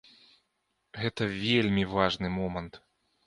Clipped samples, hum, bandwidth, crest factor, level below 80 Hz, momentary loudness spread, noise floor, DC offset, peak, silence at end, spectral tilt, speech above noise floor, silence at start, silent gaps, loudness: under 0.1%; none; 11 kHz; 22 dB; -54 dBFS; 14 LU; -78 dBFS; under 0.1%; -8 dBFS; 0.5 s; -6 dB/octave; 49 dB; 0.95 s; none; -29 LUFS